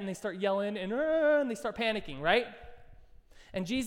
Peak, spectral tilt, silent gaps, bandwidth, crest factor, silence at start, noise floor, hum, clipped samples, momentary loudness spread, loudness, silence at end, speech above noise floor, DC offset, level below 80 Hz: -14 dBFS; -5 dB/octave; none; 15.5 kHz; 18 dB; 0 s; -55 dBFS; none; under 0.1%; 11 LU; -31 LUFS; 0 s; 24 dB; under 0.1%; -56 dBFS